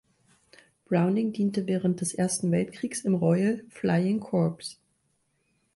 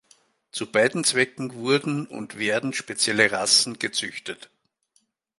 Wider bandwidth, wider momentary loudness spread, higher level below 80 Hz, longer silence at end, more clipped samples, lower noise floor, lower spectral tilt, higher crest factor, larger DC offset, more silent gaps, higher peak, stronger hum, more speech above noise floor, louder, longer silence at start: about the same, 11.5 kHz vs 12 kHz; second, 6 LU vs 16 LU; about the same, -66 dBFS vs -70 dBFS; about the same, 1.05 s vs 1.05 s; neither; first, -73 dBFS vs -68 dBFS; first, -6 dB/octave vs -2.5 dB/octave; second, 16 dB vs 24 dB; neither; neither; second, -12 dBFS vs -2 dBFS; neither; about the same, 47 dB vs 44 dB; second, -27 LUFS vs -22 LUFS; first, 0.9 s vs 0.55 s